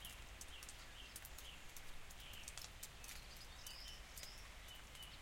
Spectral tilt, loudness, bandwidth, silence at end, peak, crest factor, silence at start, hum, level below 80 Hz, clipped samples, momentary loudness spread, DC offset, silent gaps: -1.5 dB/octave; -54 LUFS; 16.5 kHz; 0 s; -28 dBFS; 26 dB; 0 s; none; -60 dBFS; under 0.1%; 4 LU; under 0.1%; none